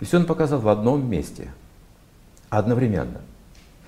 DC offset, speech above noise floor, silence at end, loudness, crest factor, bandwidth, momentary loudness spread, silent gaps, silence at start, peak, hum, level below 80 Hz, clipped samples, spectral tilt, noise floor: under 0.1%; 29 dB; 0.55 s; -22 LUFS; 20 dB; 15 kHz; 18 LU; none; 0 s; -4 dBFS; none; -46 dBFS; under 0.1%; -8 dB/octave; -51 dBFS